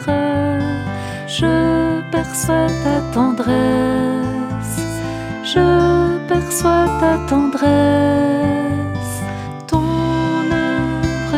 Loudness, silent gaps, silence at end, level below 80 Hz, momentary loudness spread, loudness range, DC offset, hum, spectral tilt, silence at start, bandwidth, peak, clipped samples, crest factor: -17 LUFS; none; 0 s; -34 dBFS; 9 LU; 3 LU; under 0.1%; none; -6 dB/octave; 0 s; 15.5 kHz; -2 dBFS; under 0.1%; 14 dB